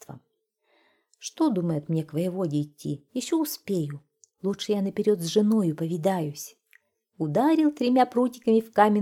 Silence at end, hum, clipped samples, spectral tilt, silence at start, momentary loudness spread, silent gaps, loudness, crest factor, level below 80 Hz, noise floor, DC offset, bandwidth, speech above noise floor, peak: 0 s; none; under 0.1%; -6 dB/octave; 0.1 s; 12 LU; none; -26 LUFS; 20 dB; -72 dBFS; -74 dBFS; under 0.1%; 17 kHz; 49 dB; -6 dBFS